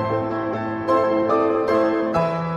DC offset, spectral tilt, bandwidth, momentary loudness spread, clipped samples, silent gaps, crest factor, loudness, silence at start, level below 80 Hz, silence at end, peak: under 0.1%; -8 dB/octave; 8.2 kHz; 6 LU; under 0.1%; none; 14 dB; -21 LUFS; 0 s; -52 dBFS; 0 s; -6 dBFS